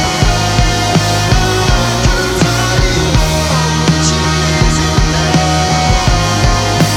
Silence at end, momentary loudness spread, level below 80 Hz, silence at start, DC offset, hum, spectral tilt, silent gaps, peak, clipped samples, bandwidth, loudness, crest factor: 0 s; 1 LU; -18 dBFS; 0 s; under 0.1%; none; -4 dB/octave; none; 0 dBFS; under 0.1%; 17 kHz; -12 LUFS; 12 dB